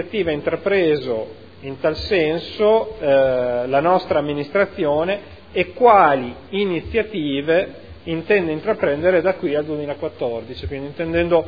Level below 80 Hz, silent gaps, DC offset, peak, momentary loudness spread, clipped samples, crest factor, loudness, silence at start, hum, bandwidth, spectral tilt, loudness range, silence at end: -44 dBFS; none; 0.4%; 0 dBFS; 11 LU; under 0.1%; 18 dB; -19 LUFS; 0 s; none; 5 kHz; -8 dB/octave; 3 LU; 0 s